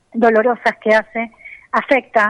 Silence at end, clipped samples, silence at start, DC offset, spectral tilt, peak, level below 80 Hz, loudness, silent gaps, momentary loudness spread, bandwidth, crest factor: 0 s; under 0.1%; 0.15 s; under 0.1%; -5.5 dB/octave; -2 dBFS; -58 dBFS; -16 LUFS; none; 12 LU; 10.5 kHz; 14 dB